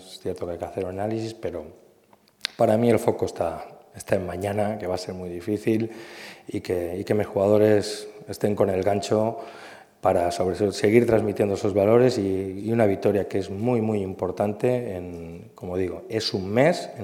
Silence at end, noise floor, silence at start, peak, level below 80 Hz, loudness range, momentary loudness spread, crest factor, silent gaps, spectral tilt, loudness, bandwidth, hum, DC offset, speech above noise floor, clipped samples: 0 s; -58 dBFS; 0 s; -2 dBFS; -58 dBFS; 6 LU; 16 LU; 22 dB; none; -6.5 dB/octave; -24 LUFS; 16.5 kHz; none; under 0.1%; 35 dB; under 0.1%